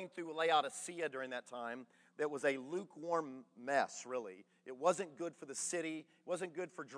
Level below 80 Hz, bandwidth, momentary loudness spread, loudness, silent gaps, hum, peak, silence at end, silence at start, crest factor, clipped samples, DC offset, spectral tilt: under -90 dBFS; 11 kHz; 14 LU; -40 LUFS; none; none; -20 dBFS; 0 s; 0 s; 22 dB; under 0.1%; under 0.1%; -3 dB/octave